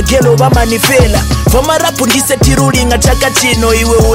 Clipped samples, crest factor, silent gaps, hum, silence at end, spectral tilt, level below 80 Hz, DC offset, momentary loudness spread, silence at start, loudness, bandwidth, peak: under 0.1%; 8 dB; none; none; 0 s; -4 dB/octave; -16 dBFS; under 0.1%; 3 LU; 0 s; -9 LUFS; 16.5 kHz; 0 dBFS